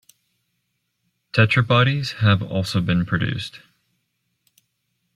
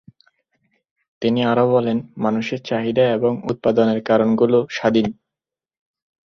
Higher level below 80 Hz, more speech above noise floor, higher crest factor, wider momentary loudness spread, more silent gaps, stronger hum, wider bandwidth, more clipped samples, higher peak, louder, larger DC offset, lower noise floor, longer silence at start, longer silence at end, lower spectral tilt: first, -52 dBFS vs -58 dBFS; second, 54 dB vs 70 dB; about the same, 20 dB vs 16 dB; about the same, 9 LU vs 7 LU; neither; neither; first, 12.5 kHz vs 6.8 kHz; neither; about the same, -2 dBFS vs -4 dBFS; about the same, -20 LUFS vs -19 LUFS; neither; second, -74 dBFS vs -88 dBFS; first, 1.35 s vs 1.2 s; first, 1.6 s vs 1.15 s; about the same, -6.5 dB/octave vs -7 dB/octave